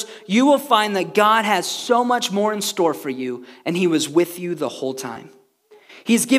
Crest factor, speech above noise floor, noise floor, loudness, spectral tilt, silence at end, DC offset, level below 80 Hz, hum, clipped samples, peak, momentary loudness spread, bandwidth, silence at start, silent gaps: 18 dB; 33 dB; -52 dBFS; -19 LUFS; -3.5 dB/octave; 0 s; under 0.1%; -80 dBFS; none; under 0.1%; -2 dBFS; 13 LU; 16 kHz; 0 s; none